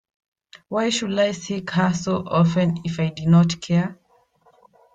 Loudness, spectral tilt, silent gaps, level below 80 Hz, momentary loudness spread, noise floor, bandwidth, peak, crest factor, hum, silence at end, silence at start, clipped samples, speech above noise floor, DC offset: -21 LUFS; -6 dB/octave; none; -56 dBFS; 8 LU; -59 dBFS; 9 kHz; -6 dBFS; 16 dB; none; 1 s; 0.7 s; under 0.1%; 39 dB; under 0.1%